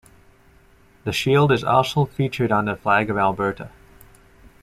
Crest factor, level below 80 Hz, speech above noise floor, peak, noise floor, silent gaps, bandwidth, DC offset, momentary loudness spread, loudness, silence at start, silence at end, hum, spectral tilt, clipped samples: 18 dB; -50 dBFS; 33 dB; -4 dBFS; -53 dBFS; none; 15 kHz; under 0.1%; 10 LU; -20 LUFS; 1.05 s; 0.95 s; none; -6 dB/octave; under 0.1%